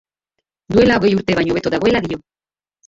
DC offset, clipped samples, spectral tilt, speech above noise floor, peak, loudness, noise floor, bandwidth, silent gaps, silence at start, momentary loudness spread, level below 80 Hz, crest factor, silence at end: under 0.1%; under 0.1%; -6.5 dB/octave; 62 dB; -2 dBFS; -16 LUFS; -77 dBFS; 7.8 kHz; none; 0.7 s; 9 LU; -44 dBFS; 16 dB; 0.7 s